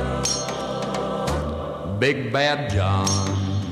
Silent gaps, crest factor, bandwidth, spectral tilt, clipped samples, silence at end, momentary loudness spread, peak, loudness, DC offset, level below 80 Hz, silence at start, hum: none; 16 dB; 13.5 kHz; -4.5 dB/octave; under 0.1%; 0 s; 6 LU; -8 dBFS; -23 LUFS; under 0.1%; -38 dBFS; 0 s; none